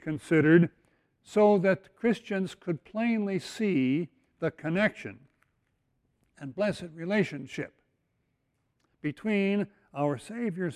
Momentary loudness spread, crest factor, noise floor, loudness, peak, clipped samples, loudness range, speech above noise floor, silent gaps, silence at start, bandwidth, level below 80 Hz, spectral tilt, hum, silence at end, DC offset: 15 LU; 22 dB; -76 dBFS; -28 LUFS; -8 dBFS; under 0.1%; 8 LU; 49 dB; none; 0.05 s; 11.5 kHz; -68 dBFS; -7 dB/octave; none; 0 s; under 0.1%